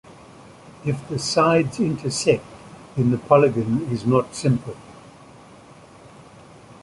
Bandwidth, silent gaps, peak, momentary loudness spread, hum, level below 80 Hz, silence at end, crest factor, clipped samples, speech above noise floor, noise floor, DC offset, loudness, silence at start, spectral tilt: 11.5 kHz; none; -2 dBFS; 15 LU; none; -54 dBFS; 0.1 s; 22 dB; under 0.1%; 26 dB; -46 dBFS; under 0.1%; -21 LUFS; 0.4 s; -6 dB/octave